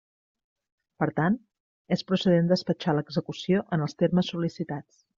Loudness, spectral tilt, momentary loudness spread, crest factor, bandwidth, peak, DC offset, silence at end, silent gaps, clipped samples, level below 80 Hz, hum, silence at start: -27 LUFS; -6 dB/octave; 9 LU; 18 dB; 7.4 kHz; -10 dBFS; under 0.1%; 0.35 s; 1.60-1.85 s; under 0.1%; -64 dBFS; none; 1 s